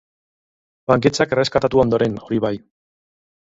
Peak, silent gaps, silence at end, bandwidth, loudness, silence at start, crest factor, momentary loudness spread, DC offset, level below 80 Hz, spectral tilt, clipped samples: 0 dBFS; none; 1 s; 7.8 kHz; -18 LUFS; 0.9 s; 20 dB; 9 LU; under 0.1%; -48 dBFS; -6 dB/octave; under 0.1%